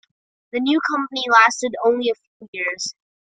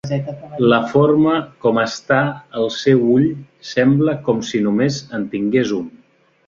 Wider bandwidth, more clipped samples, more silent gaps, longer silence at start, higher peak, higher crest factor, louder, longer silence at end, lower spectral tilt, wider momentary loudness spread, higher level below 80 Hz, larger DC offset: first, 9.4 kHz vs 7.6 kHz; neither; first, 2.27-2.40 s, 2.48-2.53 s vs none; first, 0.55 s vs 0.05 s; about the same, -2 dBFS vs -2 dBFS; about the same, 20 dB vs 16 dB; about the same, -19 LUFS vs -17 LUFS; second, 0.35 s vs 0.6 s; second, -1.5 dB/octave vs -6.5 dB/octave; first, 15 LU vs 10 LU; second, -70 dBFS vs -56 dBFS; neither